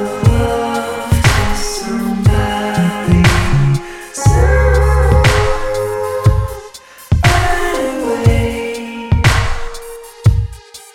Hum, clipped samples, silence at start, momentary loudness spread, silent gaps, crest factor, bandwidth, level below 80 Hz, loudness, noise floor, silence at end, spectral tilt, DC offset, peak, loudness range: none; under 0.1%; 0 s; 13 LU; none; 14 dB; 16.5 kHz; -18 dBFS; -14 LUFS; -35 dBFS; 0.1 s; -5.5 dB/octave; under 0.1%; 0 dBFS; 3 LU